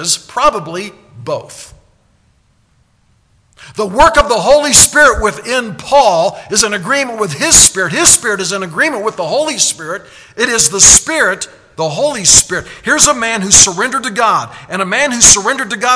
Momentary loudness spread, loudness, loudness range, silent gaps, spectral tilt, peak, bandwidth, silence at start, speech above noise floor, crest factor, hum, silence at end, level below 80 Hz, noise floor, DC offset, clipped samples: 17 LU; -9 LUFS; 8 LU; none; -1 dB/octave; 0 dBFS; 11 kHz; 0 s; 43 dB; 12 dB; none; 0 s; -34 dBFS; -54 dBFS; under 0.1%; 1%